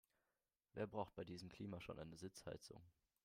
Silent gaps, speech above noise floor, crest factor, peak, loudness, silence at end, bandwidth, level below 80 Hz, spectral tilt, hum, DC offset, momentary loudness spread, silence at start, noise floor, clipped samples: none; over 37 dB; 22 dB; -32 dBFS; -54 LUFS; 0.35 s; 16 kHz; -76 dBFS; -5.5 dB/octave; none; under 0.1%; 11 LU; 0.75 s; under -90 dBFS; under 0.1%